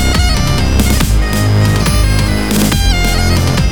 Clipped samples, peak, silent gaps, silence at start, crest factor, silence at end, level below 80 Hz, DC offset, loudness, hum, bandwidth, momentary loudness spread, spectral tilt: under 0.1%; 0 dBFS; none; 0 s; 10 dB; 0 s; -14 dBFS; 3%; -12 LUFS; none; over 20 kHz; 2 LU; -4.5 dB/octave